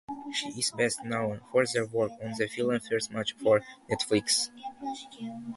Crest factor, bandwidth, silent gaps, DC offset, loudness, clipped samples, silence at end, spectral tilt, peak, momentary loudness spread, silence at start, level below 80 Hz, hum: 20 dB; 12 kHz; none; under 0.1%; -30 LUFS; under 0.1%; 0 s; -3.5 dB/octave; -10 dBFS; 13 LU; 0.1 s; -66 dBFS; none